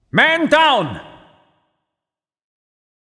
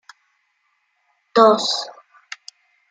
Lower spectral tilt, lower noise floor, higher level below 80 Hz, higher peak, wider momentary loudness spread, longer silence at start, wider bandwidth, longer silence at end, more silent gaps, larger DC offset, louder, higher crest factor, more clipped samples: first, -4.5 dB/octave vs -3 dB/octave; first, -87 dBFS vs -68 dBFS; first, -58 dBFS vs -76 dBFS; about the same, 0 dBFS vs -2 dBFS; second, 15 LU vs 23 LU; second, 0.15 s vs 1.35 s; first, 10.5 kHz vs 9.4 kHz; first, 2 s vs 1 s; neither; neither; first, -14 LUFS vs -17 LUFS; about the same, 20 dB vs 20 dB; neither